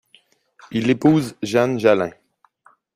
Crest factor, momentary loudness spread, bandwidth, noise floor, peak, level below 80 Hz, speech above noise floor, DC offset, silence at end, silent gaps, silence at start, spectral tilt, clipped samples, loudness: 18 dB; 9 LU; 15 kHz; -57 dBFS; -2 dBFS; -58 dBFS; 39 dB; under 0.1%; 0.85 s; none; 0.7 s; -6.5 dB/octave; under 0.1%; -19 LUFS